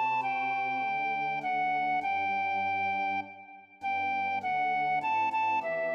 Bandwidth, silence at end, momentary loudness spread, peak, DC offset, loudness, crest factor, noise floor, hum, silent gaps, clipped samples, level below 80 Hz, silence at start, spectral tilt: 6.6 kHz; 0 s; 4 LU; -20 dBFS; under 0.1%; -30 LUFS; 10 dB; -50 dBFS; none; none; under 0.1%; -88 dBFS; 0 s; -5 dB/octave